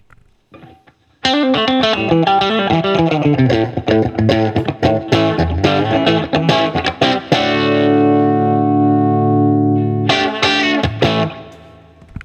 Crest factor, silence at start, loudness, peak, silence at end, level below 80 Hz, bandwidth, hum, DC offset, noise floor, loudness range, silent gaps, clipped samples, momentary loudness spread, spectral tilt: 14 dB; 0.55 s; -14 LUFS; 0 dBFS; 0 s; -42 dBFS; 8.6 kHz; none; under 0.1%; -50 dBFS; 2 LU; none; under 0.1%; 3 LU; -6.5 dB/octave